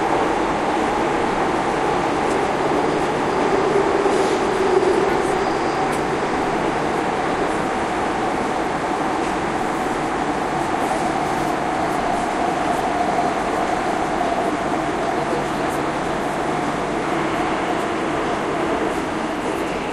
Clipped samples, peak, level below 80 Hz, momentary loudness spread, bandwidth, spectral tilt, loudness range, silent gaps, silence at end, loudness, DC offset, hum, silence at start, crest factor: under 0.1%; -4 dBFS; -42 dBFS; 4 LU; 14 kHz; -5 dB/octave; 3 LU; none; 0 s; -21 LUFS; under 0.1%; none; 0 s; 16 dB